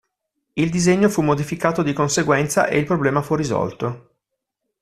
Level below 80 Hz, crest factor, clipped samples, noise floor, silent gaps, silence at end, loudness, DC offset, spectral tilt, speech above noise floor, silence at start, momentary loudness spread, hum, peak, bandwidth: -50 dBFS; 20 dB; under 0.1%; -79 dBFS; none; 0.85 s; -19 LUFS; under 0.1%; -5.5 dB/octave; 60 dB; 0.55 s; 9 LU; none; 0 dBFS; 14 kHz